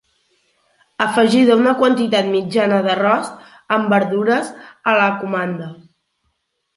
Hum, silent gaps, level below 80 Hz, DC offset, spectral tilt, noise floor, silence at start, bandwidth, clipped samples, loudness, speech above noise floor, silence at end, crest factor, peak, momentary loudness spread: none; none; -66 dBFS; under 0.1%; -5.5 dB/octave; -70 dBFS; 1 s; 11.5 kHz; under 0.1%; -16 LUFS; 54 dB; 1 s; 16 dB; -2 dBFS; 11 LU